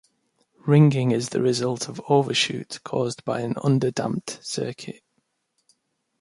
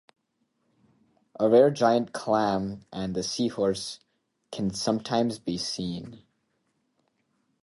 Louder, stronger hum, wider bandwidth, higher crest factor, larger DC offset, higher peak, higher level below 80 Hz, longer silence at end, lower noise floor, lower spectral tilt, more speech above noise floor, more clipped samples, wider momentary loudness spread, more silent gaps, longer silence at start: first, -23 LUFS vs -26 LUFS; neither; about the same, 11.5 kHz vs 11.5 kHz; about the same, 20 dB vs 20 dB; neither; first, -4 dBFS vs -8 dBFS; second, -66 dBFS vs -60 dBFS; second, 1.3 s vs 1.45 s; about the same, -74 dBFS vs -75 dBFS; about the same, -5.5 dB/octave vs -5 dB/octave; about the same, 51 dB vs 49 dB; neither; about the same, 13 LU vs 15 LU; neither; second, 0.65 s vs 1.4 s